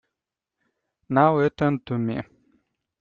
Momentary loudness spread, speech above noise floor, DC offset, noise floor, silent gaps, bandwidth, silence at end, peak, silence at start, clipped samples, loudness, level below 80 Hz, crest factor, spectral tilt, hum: 13 LU; 65 dB; under 0.1%; -86 dBFS; none; 6.8 kHz; 0.75 s; -6 dBFS; 1.1 s; under 0.1%; -23 LUFS; -60 dBFS; 20 dB; -9.5 dB/octave; none